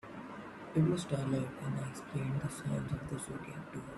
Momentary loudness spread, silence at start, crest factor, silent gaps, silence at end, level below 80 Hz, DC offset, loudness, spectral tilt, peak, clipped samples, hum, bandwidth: 14 LU; 0.05 s; 18 dB; none; 0 s; -60 dBFS; under 0.1%; -38 LUFS; -6.5 dB/octave; -18 dBFS; under 0.1%; none; 12.5 kHz